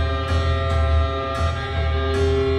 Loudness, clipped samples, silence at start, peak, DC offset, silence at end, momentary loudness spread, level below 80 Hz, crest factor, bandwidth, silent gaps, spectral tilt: -22 LUFS; under 0.1%; 0 s; -10 dBFS; under 0.1%; 0 s; 3 LU; -24 dBFS; 10 dB; 9.4 kHz; none; -6.5 dB/octave